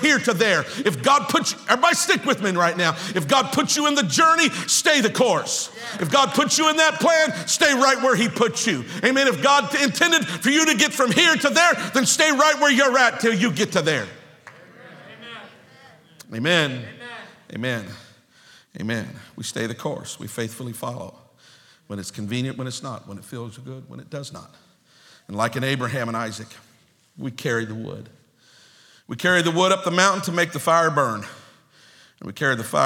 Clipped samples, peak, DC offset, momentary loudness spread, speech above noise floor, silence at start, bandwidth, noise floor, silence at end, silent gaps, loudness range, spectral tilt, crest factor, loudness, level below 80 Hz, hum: under 0.1%; 0 dBFS; under 0.1%; 20 LU; 37 dB; 0 s; 18.5 kHz; -58 dBFS; 0 s; none; 14 LU; -3 dB/octave; 22 dB; -19 LUFS; -70 dBFS; none